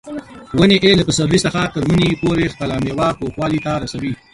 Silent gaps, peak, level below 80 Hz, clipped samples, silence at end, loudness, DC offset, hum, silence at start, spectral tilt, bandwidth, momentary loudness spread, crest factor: none; 0 dBFS; -38 dBFS; under 0.1%; 0.2 s; -16 LUFS; under 0.1%; none; 0.05 s; -5 dB/octave; 11.5 kHz; 12 LU; 16 dB